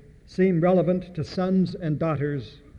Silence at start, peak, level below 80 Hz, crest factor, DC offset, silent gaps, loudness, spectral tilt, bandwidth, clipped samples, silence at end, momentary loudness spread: 0.3 s; -10 dBFS; -52 dBFS; 14 dB; under 0.1%; none; -24 LUFS; -9 dB/octave; 7.2 kHz; under 0.1%; 0 s; 10 LU